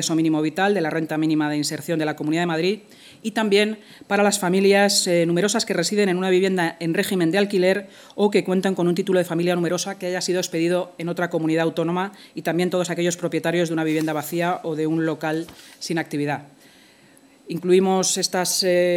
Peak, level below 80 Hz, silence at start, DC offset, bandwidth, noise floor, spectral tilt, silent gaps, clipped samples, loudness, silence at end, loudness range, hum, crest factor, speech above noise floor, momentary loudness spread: -4 dBFS; -72 dBFS; 0 s; under 0.1%; 18.5 kHz; -52 dBFS; -4.5 dB/octave; none; under 0.1%; -21 LUFS; 0 s; 5 LU; none; 16 dB; 31 dB; 8 LU